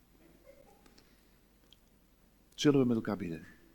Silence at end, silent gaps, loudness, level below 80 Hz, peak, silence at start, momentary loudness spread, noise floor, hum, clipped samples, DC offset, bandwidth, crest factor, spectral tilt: 0.3 s; none; -31 LUFS; -66 dBFS; -14 dBFS; 2.6 s; 19 LU; -66 dBFS; none; under 0.1%; under 0.1%; 18 kHz; 22 dB; -6 dB/octave